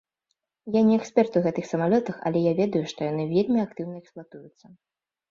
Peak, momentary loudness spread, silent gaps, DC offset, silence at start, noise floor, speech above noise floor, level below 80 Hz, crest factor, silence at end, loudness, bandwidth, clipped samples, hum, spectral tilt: -6 dBFS; 16 LU; none; under 0.1%; 0.65 s; -79 dBFS; 55 dB; -66 dBFS; 20 dB; 0.85 s; -24 LUFS; 7.4 kHz; under 0.1%; none; -7.5 dB/octave